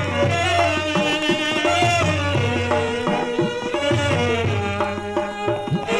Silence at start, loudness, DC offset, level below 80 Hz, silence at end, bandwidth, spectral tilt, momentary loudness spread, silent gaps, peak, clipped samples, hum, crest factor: 0 s; -20 LUFS; under 0.1%; -48 dBFS; 0 s; 13 kHz; -5 dB/octave; 6 LU; none; -6 dBFS; under 0.1%; none; 14 dB